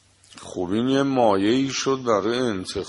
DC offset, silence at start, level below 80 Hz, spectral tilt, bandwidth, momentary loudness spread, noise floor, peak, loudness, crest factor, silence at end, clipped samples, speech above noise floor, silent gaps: under 0.1%; 0.35 s; -56 dBFS; -5 dB/octave; 11.5 kHz; 10 LU; -44 dBFS; -6 dBFS; -22 LUFS; 18 dB; 0 s; under 0.1%; 23 dB; none